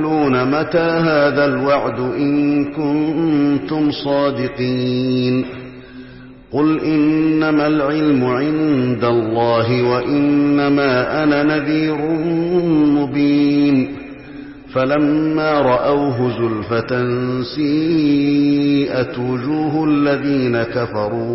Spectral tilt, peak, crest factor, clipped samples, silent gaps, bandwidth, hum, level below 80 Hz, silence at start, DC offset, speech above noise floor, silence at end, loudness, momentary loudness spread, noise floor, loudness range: -10.5 dB/octave; -4 dBFS; 12 dB; under 0.1%; none; 5.8 kHz; none; -46 dBFS; 0 s; 0.1%; 22 dB; 0 s; -16 LUFS; 6 LU; -38 dBFS; 2 LU